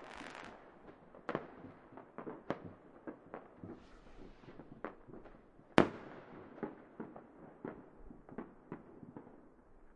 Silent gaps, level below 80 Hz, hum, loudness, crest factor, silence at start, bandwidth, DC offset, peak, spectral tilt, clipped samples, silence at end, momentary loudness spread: none; -66 dBFS; none; -43 LUFS; 42 dB; 0 s; 10 kHz; under 0.1%; -4 dBFS; -6.5 dB/octave; under 0.1%; 0 s; 17 LU